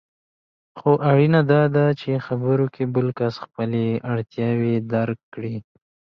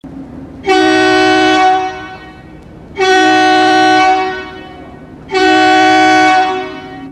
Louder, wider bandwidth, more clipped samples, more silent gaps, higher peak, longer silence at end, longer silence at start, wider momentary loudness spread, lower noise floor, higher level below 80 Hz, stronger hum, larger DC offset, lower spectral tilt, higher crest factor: second, -21 LUFS vs -9 LUFS; second, 6 kHz vs 11 kHz; neither; first, 5.23-5.32 s vs none; second, -4 dBFS vs 0 dBFS; first, 0.55 s vs 0 s; first, 0.75 s vs 0.05 s; second, 12 LU vs 20 LU; first, under -90 dBFS vs -33 dBFS; second, -60 dBFS vs -44 dBFS; neither; neither; first, -10 dB/octave vs -3.5 dB/octave; first, 18 dB vs 12 dB